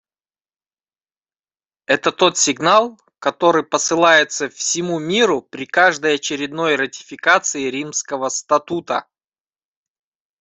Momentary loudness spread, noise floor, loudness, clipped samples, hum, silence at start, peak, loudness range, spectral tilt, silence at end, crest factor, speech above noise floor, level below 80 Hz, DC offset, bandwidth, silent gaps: 9 LU; under -90 dBFS; -17 LUFS; under 0.1%; none; 1.9 s; 0 dBFS; 4 LU; -2 dB/octave; 1.4 s; 18 dB; over 72 dB; -64 dBFS; under 0.1%; 8.4 kHz; none